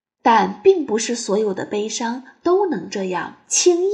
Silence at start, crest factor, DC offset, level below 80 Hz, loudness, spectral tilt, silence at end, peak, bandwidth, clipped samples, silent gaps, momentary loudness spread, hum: 0.25 s; 16 dB; under 0.1%; -68 dBFS; -19 LUFS; -3 dB/octave; 0 s; -2 dBFS; 10.5 kHz; under 0.1%; none; 9 LU; none